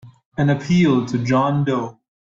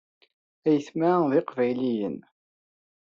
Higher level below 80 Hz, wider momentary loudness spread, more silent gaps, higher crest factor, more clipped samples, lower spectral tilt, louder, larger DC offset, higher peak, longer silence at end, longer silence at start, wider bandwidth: first, -52 dBFS vs -74 dBFS; about the same, 10 LU vs 8 LU; first, 0.26-0.32 s vs none; about the same, 14 dB vs 16 dB; neither; about the same, -7.5 dB/octave vs -6.5 dB/octave; first, -19 LUFS vs -25 LUFS; neither; first, -4 dBFS vs -10 dBFS; second, 0.3 s vs 1 s; second, 0.05 s vs 0.65 s; about the same, 7.4 kHz vs 7.4 kHz